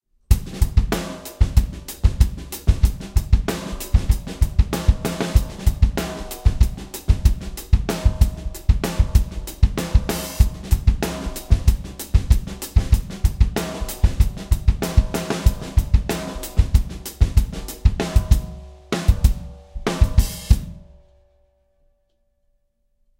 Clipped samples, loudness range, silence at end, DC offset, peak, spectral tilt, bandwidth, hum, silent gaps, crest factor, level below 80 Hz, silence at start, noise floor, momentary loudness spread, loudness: under 0.1%; 1 LU; 2.4 s; under 0.1%; 0 dBFS; -6 dB/octave; 17 kHz; none; none; 18 dB; -20 dBFS; 0.3 s; -66 dBFS; 7 LU; -22 LUFS